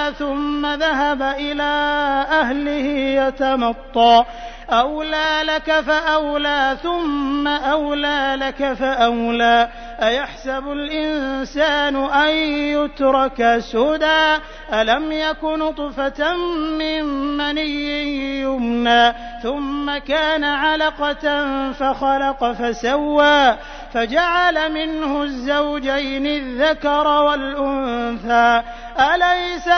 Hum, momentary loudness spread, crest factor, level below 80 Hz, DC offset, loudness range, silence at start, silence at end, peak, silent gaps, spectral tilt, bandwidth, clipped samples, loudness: none; 8 LU; 16 dB; -40 dBFS; under 0.1%; 2 LU; 0 s; 0 s; -2 dBFS; none; -3.5 dB/octave; 6.6 kHz; under 0.1%; -18 LUFS